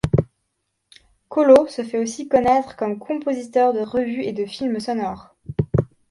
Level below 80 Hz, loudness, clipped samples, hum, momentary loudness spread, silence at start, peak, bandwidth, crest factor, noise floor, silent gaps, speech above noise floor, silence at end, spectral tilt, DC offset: -44 dBFS; -21 LUFS; under 0.1%; none; 13 LU; 0.05 s; -2 dBFS; 11.5 kHz; 20 dB; -74 dBFS; none; 55 dB; 0.25 s; -7 dB/octave; under 0.1%